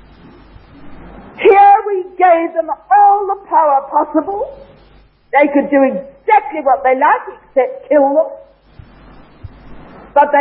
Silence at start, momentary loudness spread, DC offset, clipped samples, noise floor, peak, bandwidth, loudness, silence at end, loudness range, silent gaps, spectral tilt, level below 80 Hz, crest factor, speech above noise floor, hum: 0.8 s; 10 LU; under 0.1%; under 0.1%; -41 dBFS; 0 dBFS; 4.2 kHz; -13 LUFS; 0 s; 4 LU; none; -9 dB/octave; -48 dBFS; 14 dB; 28 dB; none